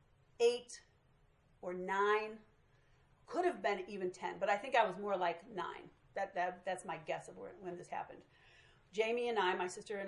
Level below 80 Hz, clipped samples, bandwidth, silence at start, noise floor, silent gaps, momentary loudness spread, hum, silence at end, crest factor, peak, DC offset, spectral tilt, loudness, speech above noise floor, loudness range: -76 dBFS; under 0.1%; 11 kHz; 0.4 s; -70 dBFS; none; 15 LU; none; 0 s; 22 dB; -18 dBFS; under 0.1%; -4 dB/octave; -38 LUFS; 32 dB; 6 LU